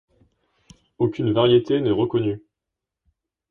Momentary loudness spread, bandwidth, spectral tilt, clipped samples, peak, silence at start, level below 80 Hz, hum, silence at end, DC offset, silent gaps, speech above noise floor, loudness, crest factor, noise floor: 9 LU; 6.6 kHz; -8.5 dB/octave; under 0.1%; -6 dBFS; 1 s; -56 dBFS; none; 1.1 s; under 0.1%; none; 65 dB; -21 LUFS; 18 dB; -85 dBFS